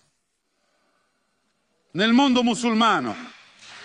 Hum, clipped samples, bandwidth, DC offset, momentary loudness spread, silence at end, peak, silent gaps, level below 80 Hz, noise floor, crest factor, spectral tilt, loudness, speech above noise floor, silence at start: none; under 0.1%; 10.5 kHz; under 0.1%; 21 LU; 0 s; -6 dBFS; none; -66 dBFS; -73 dBFS; 18 dB; -4 dB/octave; -20 LUFS; 54 dB; 1.95 s